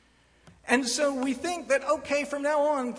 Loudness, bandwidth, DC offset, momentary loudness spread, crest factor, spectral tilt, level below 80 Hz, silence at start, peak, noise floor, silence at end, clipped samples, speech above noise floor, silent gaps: -27 LUFS; 11 kHz; under 0.1%; 5 LU; 20 dB; -2 dB/octave; -64 dBFS; 0.45 s; -6 dBFS; -58 dBFS; 0 s; under 0.1%; 32 dB; none